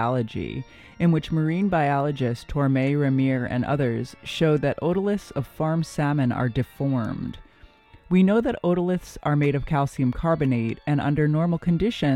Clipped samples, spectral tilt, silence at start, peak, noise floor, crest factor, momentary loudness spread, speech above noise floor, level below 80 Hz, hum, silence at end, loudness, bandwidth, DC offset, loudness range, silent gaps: under 0.1%; -8 dB/octave; 0 s; -8 dBFS; -51 dBFS; 16 dB; 7 LU; 28 dB; -46 dBFS; none; 0 s; -24 LUFS; 12.5 kHz; under 0.1%; 2 LU; none